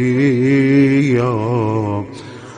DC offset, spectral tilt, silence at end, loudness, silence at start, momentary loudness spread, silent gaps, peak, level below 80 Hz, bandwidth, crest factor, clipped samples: under 0.1%; -8 dB/octave; 0 s; -15 LUFS; 0 s; 12 LU; none; -2 dBFS; -52 dBFS; 9.6 kHz; 14 dB; under 0.1%